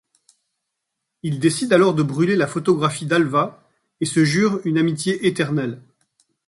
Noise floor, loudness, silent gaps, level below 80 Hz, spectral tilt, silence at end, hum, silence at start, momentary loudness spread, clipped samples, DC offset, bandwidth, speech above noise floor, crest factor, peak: -79 dBFS; -19 LUFS; none; -60 dBFS; -5.5 dB/octave; 0.7 s; none; 1.25 s; 11 LU; under 0.1%; under 0.1%; 11.5 kHz; 61 dB; 18 dB; -2 dBFS